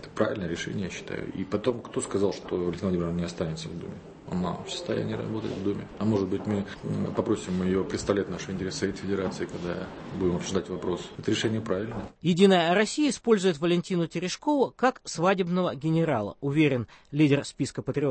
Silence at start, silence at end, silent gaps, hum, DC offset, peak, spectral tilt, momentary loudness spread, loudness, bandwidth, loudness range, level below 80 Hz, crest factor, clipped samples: 0 s; 0 s; none; none; under 0.1%; -8 dBFS; -5.5 dB/octave; 10 LU; -28 LUFS; 8.8 kHz; 6 LU; -54 dBFS; 20 dB; under 0.1%